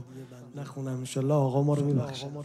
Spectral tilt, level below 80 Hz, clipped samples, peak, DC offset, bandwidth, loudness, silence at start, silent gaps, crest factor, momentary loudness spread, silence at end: -7.5 dB/octave; -68 dBFS; under 0.1%; -14 dBFS; under 0.1%; 12.5 kHz; -28 LUFS; 0 s; none; 14 dB; 19 LU; 0 s